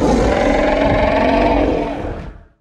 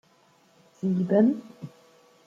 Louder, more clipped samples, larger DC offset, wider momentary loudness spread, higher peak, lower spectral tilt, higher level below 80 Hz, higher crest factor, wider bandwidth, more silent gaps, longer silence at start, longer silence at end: first, -15 LUFS vs -25 LUFS; neither; neither; second, 11 LU vs 23 LU; first, -2 dBFS vs -10 dBFS; second, -6.5 dB/octave vs -9.5 dB/octave; first, -24 dBFS vs -74 dBFS; about the same, 14 dB vs 18 dB; first, 11 kHz vs 7.4 kHz; neither; second, 0 s vs 0.85 s; second, 0.3 s vs 0.6 s